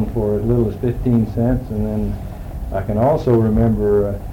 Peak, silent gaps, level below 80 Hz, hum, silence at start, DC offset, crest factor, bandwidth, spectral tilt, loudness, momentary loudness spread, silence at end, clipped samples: -6 dBFS; none; -28 dBFS; none; 0 s; under 0.1%; 12 dB; 16.5 kHz; -10 dB/octave; -18 LUFS; 10 LU; 0 s; under 0.1%